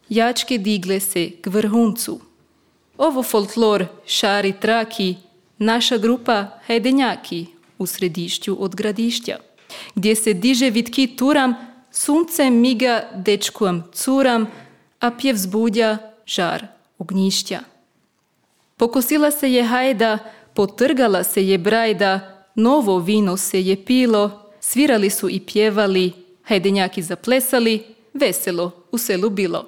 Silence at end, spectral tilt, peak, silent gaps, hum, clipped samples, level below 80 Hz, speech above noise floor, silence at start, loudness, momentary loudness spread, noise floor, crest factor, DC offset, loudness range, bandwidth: 0 s; -4 dB/octave; -4 dBFS; none; none; under 0.1%; -64 dBFS; 47 dB; 0.1 s; -19 LUFS; 9 LU; -65 dBFS; 14 dB; under 0.1%; 4 LU; 18.5 kHz